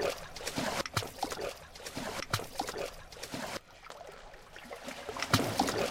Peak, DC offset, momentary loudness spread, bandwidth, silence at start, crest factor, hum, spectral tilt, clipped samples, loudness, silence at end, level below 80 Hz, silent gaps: -10 dBFS; under 0.1%; 18 LU; 16.5 kHz; 0 s; 26 dB; none; -3.5 dB/octave; under 0.1%; -36 LUFS; 0 s; -56 dBFS; none